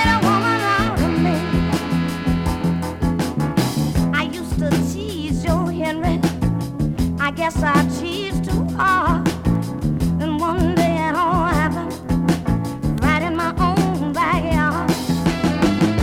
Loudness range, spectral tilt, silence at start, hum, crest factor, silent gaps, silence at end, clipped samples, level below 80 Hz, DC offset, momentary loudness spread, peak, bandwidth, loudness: 2 LU; -6 dB/octave; 0 s; none; 16 dB; none; 0 s; under 0.1%; -32 dBFS; under 0.1%; 5 LU; -2 dBFS; 16 kHz; -19 LUFS